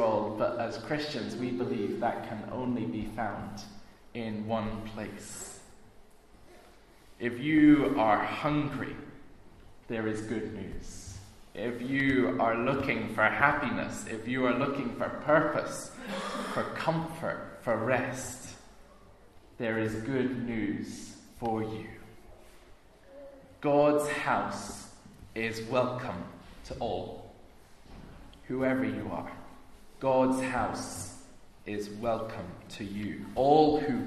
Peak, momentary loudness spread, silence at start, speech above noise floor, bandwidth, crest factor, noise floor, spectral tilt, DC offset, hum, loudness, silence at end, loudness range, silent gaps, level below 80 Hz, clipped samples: -8 dBFS; 19 LU; 0 s; 26 dB; 13.5 kHz; 24 dB; -56 dBFS; -5.5 dB/octave; under 0.1%; none; -31 LUFS; 0 s; 9 LU; none; -56 dBFS; under 0.1%